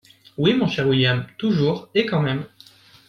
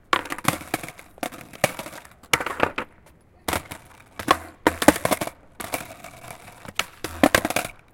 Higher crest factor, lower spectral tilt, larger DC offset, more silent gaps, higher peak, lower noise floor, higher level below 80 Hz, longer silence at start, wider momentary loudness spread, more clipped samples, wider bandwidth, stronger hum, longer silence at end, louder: second, 18 dB vs 26 dB; first, -7 dB/octave vs -3 dB/octave; neither; neither; second, -4 dBFS vs 0 dBFS; about the same, -50 dBFS vs -53 dBFS; second, -56 dBFS vs -50 dBFS; first, 0.4 s vs 0.1 s; second, 9 LU vs 21 LU; neither; second, 7 kHz vs 17 kHz; neither; first, 0.6 s vs 0.2 s; first, -21 LUFS vs -25 LUFS